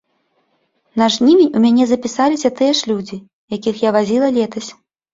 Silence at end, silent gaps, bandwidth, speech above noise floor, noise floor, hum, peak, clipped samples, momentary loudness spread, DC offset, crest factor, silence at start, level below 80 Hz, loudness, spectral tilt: 0.4 s; 3.33-3.48 s; 7.8 kHz; 50 dB; -64 dBFS; none; -2 dBFS; under 0.1%; 16 LU; under 0.1%; 14 dB; 0.95 s; -58 dBFS; -15 LUFS; -4.5 dB/octave